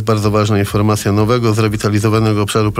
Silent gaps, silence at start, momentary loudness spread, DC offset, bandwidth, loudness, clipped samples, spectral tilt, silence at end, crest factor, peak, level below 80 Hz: none; 0 s; 1 LU; under 0.1%; 15.5 kHz; -14 LUFS; under 0.1%; -6 dB/octave; 0 s; 12 dB; -2 dBFS; -38 dBFS